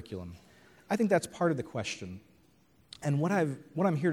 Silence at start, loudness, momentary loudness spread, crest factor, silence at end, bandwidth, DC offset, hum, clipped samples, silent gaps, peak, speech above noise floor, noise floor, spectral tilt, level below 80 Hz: 0 s; -31 LUFS; 18 LU; 20 dB; 0 s; 15 kHz; under 0.1%; none; under 0.1%; none; -12 dBFS; 35 dB; -65 dBFS; -6.5 dB/octave; -66 dBFS